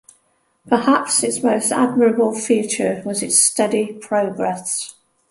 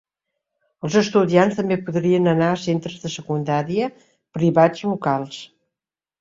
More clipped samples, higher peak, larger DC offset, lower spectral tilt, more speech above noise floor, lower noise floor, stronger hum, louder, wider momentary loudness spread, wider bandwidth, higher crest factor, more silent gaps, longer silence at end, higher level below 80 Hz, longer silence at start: neither; about the same, -2 dBFS vs -2 dBFS; neither; second, -3 dB/octave vs -6.5 dB/octave; second, 45 dB vs 69 dB; second, -63 dBFS vs -89 dBFS; neither; about the same, -18 LUFS vs -20 LUFS; second, 9 LU vs 13 LU; first, 12 kHz vs 7.8 kHz; about the same, 18 dB vs 18 dB; neither; second, 0.4 s vs 0.75 s; about the same, -64 dBFS vs -60 dBFS; second, 0.65 s vs 0.85 s